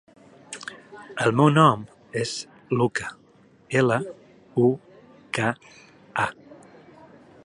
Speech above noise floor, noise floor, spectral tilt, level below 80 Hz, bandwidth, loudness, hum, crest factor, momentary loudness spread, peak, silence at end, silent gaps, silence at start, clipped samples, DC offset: 34 dB; -56 dBFS; -6 dB/octave; -64 dBFS; 11 kHz; -24 LUFS; none; 22 dB; 19 LU; -2 dBFS; 0.9 s; none; 0.5 s; under 0.1%; under 0.1%